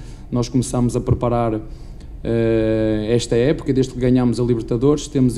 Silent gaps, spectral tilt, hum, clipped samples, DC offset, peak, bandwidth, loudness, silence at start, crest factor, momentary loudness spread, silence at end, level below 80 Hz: none; -7 dB/octave; none; under 0.1%; under 0.1%; -4 dBFS; 12 kHz; -19 LUFS; 0 s; 14 dB; 9 LU; 0 s; -34 dBFS